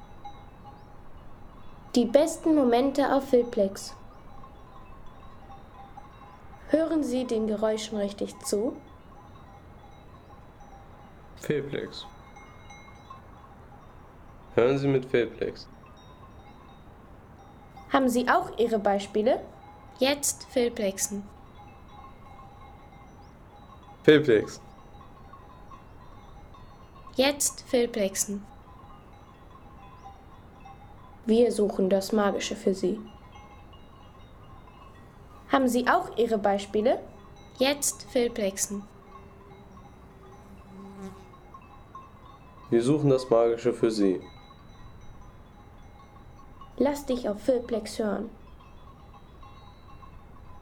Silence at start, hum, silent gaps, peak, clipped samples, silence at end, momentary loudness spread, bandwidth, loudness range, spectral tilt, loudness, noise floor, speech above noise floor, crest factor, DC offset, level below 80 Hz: 0 s; none; none; -6 dBFS; under 0.1%; 0 s; 26 LU; 18.5 kHz; 11 LU; -4.5 dB/octave; -26 LUFS; -50 dBFS; 25 dB; 24 dB; under 0.1%; -54 dBFS